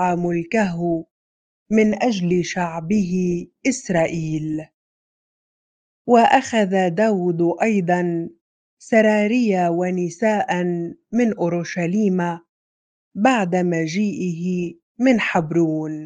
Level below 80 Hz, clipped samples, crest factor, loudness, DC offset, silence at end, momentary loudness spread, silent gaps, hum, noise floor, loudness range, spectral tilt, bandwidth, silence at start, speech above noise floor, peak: -58 dBFS; under 0.1%; 20 dB; -20 LUFS; under 0.1%; 0 s; 8 LU; 1.11-1.66 s, 4.74-6.05 s, 8.41-8.77 s, 12.49-13.11 s, 14.82-14.95 s; none; under -90 dBFS; 3 LU; -6.5 dB/octave; 9.4 kHz; 0 s; over 71 dB; -2 dBFS